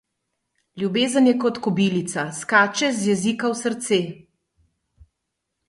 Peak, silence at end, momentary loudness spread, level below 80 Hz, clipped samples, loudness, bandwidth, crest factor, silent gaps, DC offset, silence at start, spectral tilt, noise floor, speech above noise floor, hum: -2 dBFS; 1.55 s; 9 LU; -64 dBFS; under 0.1%; -21 LUFS; 11.5 kHz; 20 dB; none; under 0.1%; 0.75 s; -4.5 dB/octave; -79 dBFS; 59 dB; none